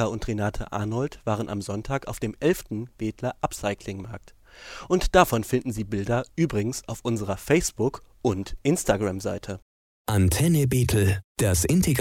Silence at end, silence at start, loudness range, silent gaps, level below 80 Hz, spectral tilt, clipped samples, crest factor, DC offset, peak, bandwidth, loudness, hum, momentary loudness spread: 0 s; 0 s; 5 LU; 9.62-10.05 s, 11.24-11.35 s; -40 dBFS; -5.5 dB/octave; under 0.1%; 22 dB; under 0.1%; -4 dBFS; 17.5 kHz; -26 LUFS; none; 13 LU